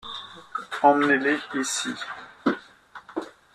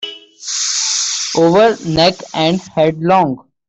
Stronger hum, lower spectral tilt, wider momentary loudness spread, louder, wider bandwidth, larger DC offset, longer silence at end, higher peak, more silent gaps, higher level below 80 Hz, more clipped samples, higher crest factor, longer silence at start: neither; about the same, -3 dB/octave vs -3.5 dB/octave; first, 16 LU vs 8 LU; second, -24 LUFS vs -14 LUFS; first, 13.5 kHz vs 8.4 kHz; neither; about the same, 0.25 s vs 0.3 s; second, -6 dBFS vs -2 dBFS; neither; second, -70 dBFS vs -48 dBFS; neither; first, 22 dB vs 14 dB; about the same, 0.05 s vs 0 s